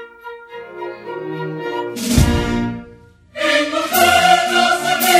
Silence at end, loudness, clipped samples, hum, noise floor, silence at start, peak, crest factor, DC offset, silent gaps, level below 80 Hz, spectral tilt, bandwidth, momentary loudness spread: 0 s; -16 LUFS; under 0.1%; none; -43 dBFS; 0 s; 0 dBFS; 16 dB; under 0.1%; none; -30 dBFS; -3.5 dB/octave; 16 kHz; 21 LU